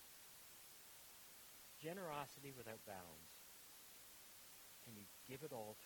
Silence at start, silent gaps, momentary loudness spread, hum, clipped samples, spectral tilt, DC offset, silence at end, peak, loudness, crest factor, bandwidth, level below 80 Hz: 0 s; none; 8 LU; none; under 0.1%; -3.5 dB/octave; under 0.1%; 0 s; -34 dBFS; -56 LUFS; 24 dB; 19 kHz; -84 dBFS